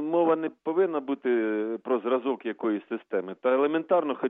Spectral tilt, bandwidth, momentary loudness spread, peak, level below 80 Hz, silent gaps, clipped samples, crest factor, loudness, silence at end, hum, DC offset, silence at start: -9.5 dB/octave; 3.9 kHz; 7 LU; -12 dBFS; -88 dBFS; none; under 0.1%; 14 dB; -27 LUFS; 0 s; none; under 0.1%; 0 s